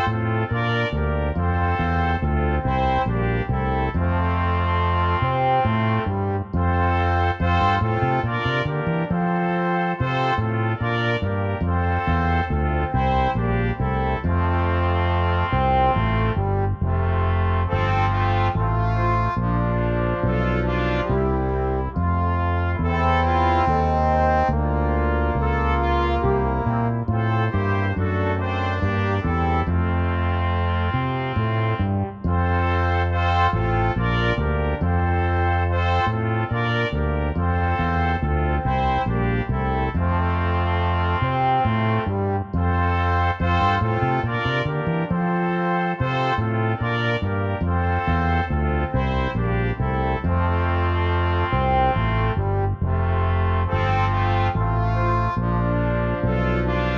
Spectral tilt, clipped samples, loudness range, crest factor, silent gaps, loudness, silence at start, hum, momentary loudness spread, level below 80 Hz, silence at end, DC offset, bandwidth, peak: -8.5 dB/octave; under 0.1%; 1 LU; 12 dB; none; -22 LUFS; 0 s; none; 3 LU; -30 dBFS; 0 s; under 0.1%; 6.2 kHz; -8 dBFS